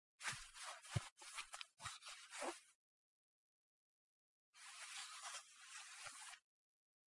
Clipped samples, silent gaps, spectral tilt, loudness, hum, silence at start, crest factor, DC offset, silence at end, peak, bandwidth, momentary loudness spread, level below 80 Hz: under 0.1%; 1.12-1.16 s, 2.75-4.53 s; -2.5 dB/octave; -52 LUFS; none; 0.2 s; 30 dB; under 0.1%; 0.7 s; -26 dBFS; 11.5 kHz; 9 LU; -78 dBFS